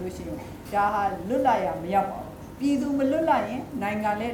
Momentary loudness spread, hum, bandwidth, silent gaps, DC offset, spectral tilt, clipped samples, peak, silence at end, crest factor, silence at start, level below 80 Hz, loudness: 13 LU; none; 18.5 kHz; none; under 0.1%; -6.5 dB/octave; under 0.1%; -8 dBFS; 0 s; 18 dB; 0 s; -50 dBFS; -26 LUFS